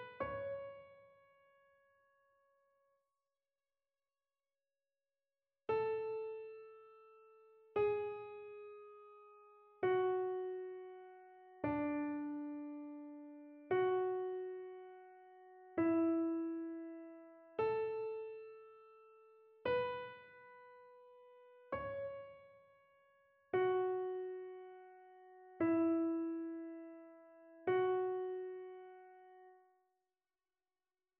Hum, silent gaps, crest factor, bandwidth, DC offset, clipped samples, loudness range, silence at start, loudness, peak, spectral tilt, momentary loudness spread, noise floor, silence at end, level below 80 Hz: none; none; 18 dB; 4.3 kHz; under 0.1%; under 0.1%; 7 LU; 0 s; -40 LUFS; -24 dBFS; -5.5 dB/octave; 25 LU; under -90 dBFS; 1.65 s; -78 dBFS